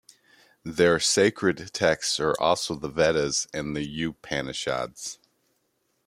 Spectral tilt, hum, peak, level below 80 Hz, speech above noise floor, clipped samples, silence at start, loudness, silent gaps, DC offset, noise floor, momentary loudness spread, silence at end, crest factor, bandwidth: -3 dB/octave; none; -6 dBFS; -56 dBFS; 48 dB; under 0.1%; 0.65 s; -25 LUFS; none; under 0.1%; -73 dBFS; 13 LU; 0.95 s; 20 dB; 16 kHz